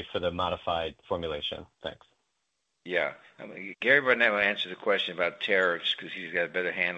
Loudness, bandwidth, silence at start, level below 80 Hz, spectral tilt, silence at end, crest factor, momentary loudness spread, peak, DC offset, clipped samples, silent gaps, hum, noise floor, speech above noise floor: -28 LUFS; 8.4 kHz; 0 s; -64 dBFS; -5 dB/octave; 0 s; 22 dB; 18 LU; -8 dBFS; under 0.1%; under 0.1%; none; none; -80 dBFS; 50 dB